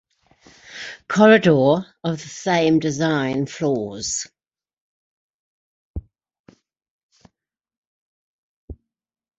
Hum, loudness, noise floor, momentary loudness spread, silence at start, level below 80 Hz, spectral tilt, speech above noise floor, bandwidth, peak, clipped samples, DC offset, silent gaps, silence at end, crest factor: none; -19 LUFS; -80 dBFS; 24 LU; 0.7 s; -50 dBFS; -5 dB/octave; 62 dB; 8.2 kHz; -2 dBFS; under 0.1%; under 0.1%; 4.81-5.94 s, 6.39-6.44 s, 6.90-7.09 s, 7.77-8.68 s; 0.65 s; 20 dB